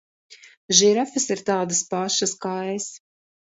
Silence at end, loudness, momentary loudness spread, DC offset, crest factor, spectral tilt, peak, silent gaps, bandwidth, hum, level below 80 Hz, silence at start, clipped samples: 0.65 s; -21 LUFS; 12 LU; under 0.1%; 24 dB; -2.5 dB/octave; 0 dBFS; 0.57-0.69 s; 8 kHz; none; -70 dBFS; 0.3 s; under 0.1%